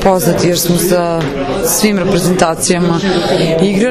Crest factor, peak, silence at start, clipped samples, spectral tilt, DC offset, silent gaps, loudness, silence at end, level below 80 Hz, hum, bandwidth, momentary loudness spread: 12 dB; 0 dBFS; 0 s; 0.2%; -4.5 dB/octave; under 0.1%; none; -12 LUFS; 0 s; -34 dBFS; none; 14.5 kHz; 3 LU